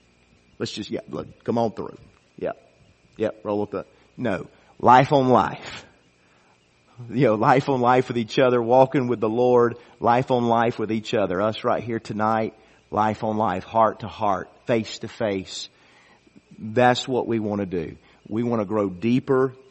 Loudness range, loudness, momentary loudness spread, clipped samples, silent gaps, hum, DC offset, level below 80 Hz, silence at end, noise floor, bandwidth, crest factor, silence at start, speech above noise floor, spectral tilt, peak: 9 LU; -22 LUFS; 14 LU; under 0.1%; none; none; under 0.1%; -60 dBFS; 0.15 s; -59 dBFS; 8.4 kHz; 22 dB; 0.6 s; 37 dB; -6.5 dB/octave; 0 dBFS